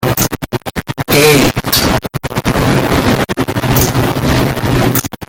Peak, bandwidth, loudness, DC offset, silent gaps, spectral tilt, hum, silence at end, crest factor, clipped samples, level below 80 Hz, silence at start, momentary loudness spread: 0 dBFS; 17.5 kHz; -12 LUFS; under 0.1%; none; -4.5 dB/octave; none; 0.05 s; 12 dB; under 0.1%; -28 dBFS; 0 s; 11 LU